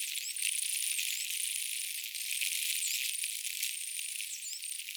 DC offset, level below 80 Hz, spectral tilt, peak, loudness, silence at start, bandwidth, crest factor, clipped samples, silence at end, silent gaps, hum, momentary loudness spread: under 0.1%; under -90 dBFS; 12.5 dB/octave; -14 dBFS; -33 LUFS; 0 s; over 20 kHz; 24 dB; under 0.1%; 0 s; none; none; 6 LU